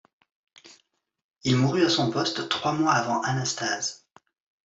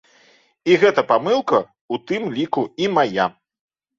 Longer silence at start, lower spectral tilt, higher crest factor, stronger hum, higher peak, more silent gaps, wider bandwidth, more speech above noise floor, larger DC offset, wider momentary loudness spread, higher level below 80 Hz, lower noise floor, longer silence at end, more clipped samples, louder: about the same, 0.65 s vs 0.65 s; second, -4 dB/octave vs -5.5 dB/octave; about the same, 18 dB vs 18 dB; neither; second, -10 dBFS vs -2 dBFS; about the same, 1.24-1.29 s vs 1.81-1.89 s; about the same, 8 kHz vs 7.6 kHz; first, 46 dB vs 37 dB; neither; second, 6 LU vs 10 LU; about the same, -66 dBFS vs -64 dBFS; first, -70 dBFS vs -55 dBFS; about the same, 0.7 s vs 0.7 s; neither; second, -25 LUFS vs -19 LUFS